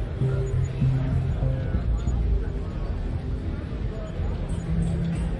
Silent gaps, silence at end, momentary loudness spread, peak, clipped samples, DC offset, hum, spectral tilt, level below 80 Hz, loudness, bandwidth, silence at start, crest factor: none; 0 s; 7 LU; -12 dBFS; under 0.1%; under 0.1%; none; -8.5 dB/octave; -30 dBFS; -28 LUFS; 10 kHz; 0 s; 14 dB